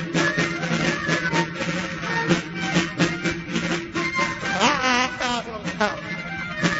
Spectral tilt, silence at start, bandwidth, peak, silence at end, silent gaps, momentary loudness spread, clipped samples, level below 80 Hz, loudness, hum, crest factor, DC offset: -4 dB/octave; 0 s; 8 kHz; -2 dBFS; 0 s; none; 7 LU; under 0.1%; -50 dBFS; -23 LUFS; none; 20 dB; under 0.1%